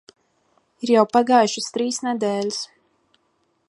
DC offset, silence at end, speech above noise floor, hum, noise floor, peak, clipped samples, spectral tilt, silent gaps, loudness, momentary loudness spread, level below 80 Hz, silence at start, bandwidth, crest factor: under 0.1%; 1.05 s; 48 dB; none; -68 dBFS; -2 dBFS; under 0.1%; -3.5 dB/octave; none; -20 LUFS; 13 LU; -74 dBFS; 0.8 s; 11.5 kHz; 20 dB